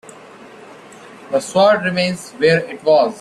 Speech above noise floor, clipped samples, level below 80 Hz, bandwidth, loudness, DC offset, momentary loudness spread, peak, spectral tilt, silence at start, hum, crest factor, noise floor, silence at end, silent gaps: 24 dB; under 0.1%; -60 dBFS; 13 kHz; -16 LUFS; under 0.1%; 8 LU; -2 dBFS; -5 dB/octave; 0.05 s; none; 14 dB; -40 dBFS; 0 s; none